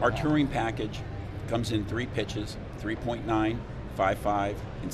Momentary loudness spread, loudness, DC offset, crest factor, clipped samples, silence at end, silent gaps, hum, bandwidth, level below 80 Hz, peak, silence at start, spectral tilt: 11 LU; -30 LUFS; under 0.1%; 18 dB; under 0.1%; 0 s; none; none; 13.5 kHz; -42 dBFS; -12 dBFS; 0 s; -6.5 dB/octave